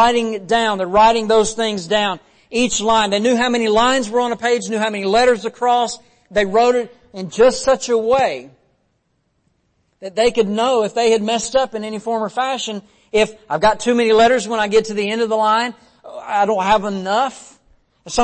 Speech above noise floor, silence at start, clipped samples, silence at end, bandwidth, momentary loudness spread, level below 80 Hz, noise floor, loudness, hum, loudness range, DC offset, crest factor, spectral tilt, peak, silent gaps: 49 dB; 0 s; under 0.1%; 0 s; 8.8 kHz; 10 LU; -46 dBFS; -66 dBFS; -17 LUFS; none; 3 LU; under 0.1%; 14 dB; -3.5 dB/octave; -4 dBFS; none